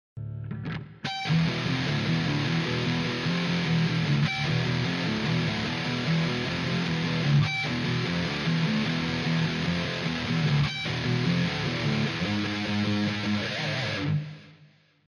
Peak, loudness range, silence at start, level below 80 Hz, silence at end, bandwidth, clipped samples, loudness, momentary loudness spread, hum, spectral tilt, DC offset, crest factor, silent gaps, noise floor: -12 dBFS; 1 LU; 0.15 s; -52 dBFS; 0.4 s; 11 kHz; under 0.1%; -27 LUFS; 4 LU; none; -6 dB/octave; under 0.1%; 14 dB; none; -58 dBFS